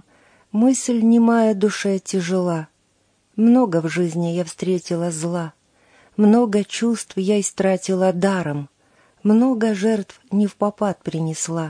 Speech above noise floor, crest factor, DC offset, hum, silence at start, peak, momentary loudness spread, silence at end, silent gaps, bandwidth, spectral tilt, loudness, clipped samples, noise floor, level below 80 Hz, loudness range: 45 dB; 14 dB; under 0.1%; none; 0.55 s; -6 dBFS; 10 LU; 0 s; none; 10.5 kHz; -6 dB/octave; -19 LUFS; under 0.1%; -63 dBFS; -66 dBFS; 2 LU